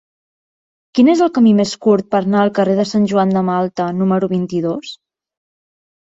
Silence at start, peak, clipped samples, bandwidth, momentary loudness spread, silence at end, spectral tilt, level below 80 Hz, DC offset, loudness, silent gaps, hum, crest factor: 0.95 s; -2 dBFS; under 0.1%; 7.8 kHz; 8 LU; 1.1 s; -7 dB/octave; -58 dBFS; under 0.1%; -15 LUFS; none; none; 14 dB